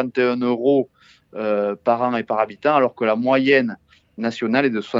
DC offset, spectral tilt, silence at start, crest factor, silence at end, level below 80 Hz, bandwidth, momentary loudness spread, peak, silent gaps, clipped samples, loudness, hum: under 0.1%; -7 dB/octave; 0 s; 18 dB; 0 s; -68 dBFS; 7.6 kHz; 10 LU; -2 dBFS; none; under 0.1%; -20 LUFS; none